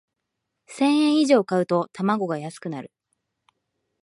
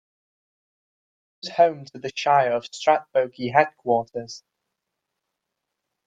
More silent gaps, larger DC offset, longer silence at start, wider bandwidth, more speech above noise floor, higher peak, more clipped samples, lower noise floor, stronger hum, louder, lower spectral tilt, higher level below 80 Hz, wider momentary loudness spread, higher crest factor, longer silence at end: neither; neither; second, 0.7 s vs 1.45 s; first, 11.5 kHz vs 8.8 kHz; about the same, 59 dB vs 60 dB; about the same, -6 dBFS vs -4 dBFS; neither; about the same, -81 dBFS vs -82 dBFS; neither; about the same, -22 LUFS vs -22 LUFS; first, -6 dB/octave vs -4.5 dB/octave; second, -76 dBFS vs -70 dBFS; about the same, 15 LU vs 14 LU; about the same, 18 dB vs 22 dB; second, 1.15 s vs 1.7 s